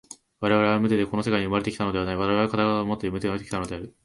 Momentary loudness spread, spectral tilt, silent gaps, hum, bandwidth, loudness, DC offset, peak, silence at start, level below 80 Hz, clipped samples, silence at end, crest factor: 8 LU; -6.5 dB/octave; none; none; 11.5 kHz; -25 LUFS; under 0.1%; -8 dBFS; 0.1 s; -50 dBFS; under 0.1%; 0.15 s; 16 dB